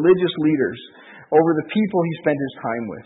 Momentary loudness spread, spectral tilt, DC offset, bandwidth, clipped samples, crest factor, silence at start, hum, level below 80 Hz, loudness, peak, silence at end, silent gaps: 9 LU; -12 dB/octave; under 0.1%; 4 kHz; under 0.1%; 16 dB; 0 s; none; -64 dBFS; -20 LUFS; -4 dBFS; 0.05 s; none